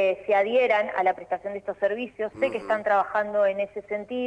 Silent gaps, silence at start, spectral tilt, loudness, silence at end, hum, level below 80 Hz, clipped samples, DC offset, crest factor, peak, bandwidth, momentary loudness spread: none; 0 s; -5.5 dB/octave; -25 LUFS; 0 s; 50 Hz at -65 dBFS; -66 dBFS; under 0.1%; under 0.1%; 14 dB; -10 dBFS; 9.6 kHz; 10 LU